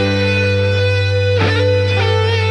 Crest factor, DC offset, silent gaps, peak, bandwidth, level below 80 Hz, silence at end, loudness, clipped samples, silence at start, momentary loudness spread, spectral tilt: 12 dB; under 0.1%; none; -2 dBFS; 9 kHz; -44 dBFS; 0 s; -14 LUFS; under 0.1%; 0 s; 1 LU; -6 dB/octave